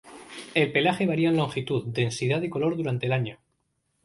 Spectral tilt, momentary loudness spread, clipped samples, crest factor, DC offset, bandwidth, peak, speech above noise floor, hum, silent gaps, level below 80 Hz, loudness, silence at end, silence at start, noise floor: -6 dB/octave; 6 LU; under 0.1%; 20 dB; under 0.1%; 11.5 kHz; -8 dBFS; 49 dB; none; none; -62 dBFS; -26 LUFS; 0.7 s; 0.05 s; -74 dBFS